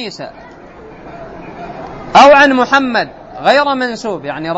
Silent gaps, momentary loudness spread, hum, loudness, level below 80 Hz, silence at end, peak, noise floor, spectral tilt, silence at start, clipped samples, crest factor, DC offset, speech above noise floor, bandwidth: none; 25 LU; none; -10 LUFS; -44 dBFS; 0 s; 0 dBFS; -35 dBFS; -4 dB/octave; 0 s; 0.2%; 14 dB; under 0.1%; 24 dB; 8.4 kHz